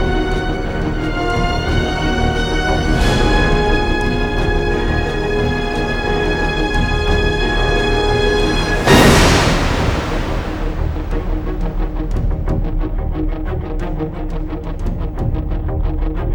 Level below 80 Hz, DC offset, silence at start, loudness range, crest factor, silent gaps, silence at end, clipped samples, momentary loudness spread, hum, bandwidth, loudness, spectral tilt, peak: -20 dBFS; under 0.1%; 0 s; 9 LU; 16 dB; none; 0 s; under 0.1%; 9 LU; none; 16.5 kHz; -17 LUFS; -5.5 dB/octave; 0 dBFS